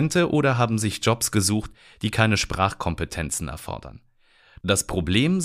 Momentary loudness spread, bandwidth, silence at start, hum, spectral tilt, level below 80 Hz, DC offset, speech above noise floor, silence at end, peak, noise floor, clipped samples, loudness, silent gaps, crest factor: 12 LU; 15.5 kHz; 0 s; none; -4.5 dB/octave; -42 dBFS; under 0.1%; 34 dB; 0 s; -4 dBFS; -57 dBFS; under 0.1%; -23 LUFS; none; 20 dB